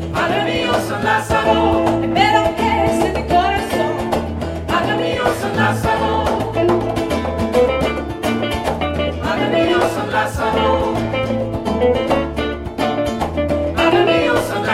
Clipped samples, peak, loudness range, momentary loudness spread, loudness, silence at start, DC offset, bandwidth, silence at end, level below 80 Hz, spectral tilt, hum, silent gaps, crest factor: under 0.1%; -2 dBFS; 3 LU; 6 LU; -17 LUFS; 0 s; under 0.1%; 16 kHz; 0 s; -34 dBFS; -5.5 dB/octave; none; none; 16 dB